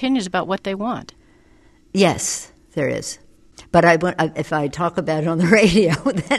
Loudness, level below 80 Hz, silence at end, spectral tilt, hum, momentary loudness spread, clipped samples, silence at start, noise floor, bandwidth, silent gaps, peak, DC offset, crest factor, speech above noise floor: -19 LUFS; -46 dBFS; 0 s; -5 dB/octave; none; 13 LU; under 0.1%; 0 s; -52 dBFS; 12.5 kHz; none; 0 dBFS; under 0.1%; 20 dB; 33 dB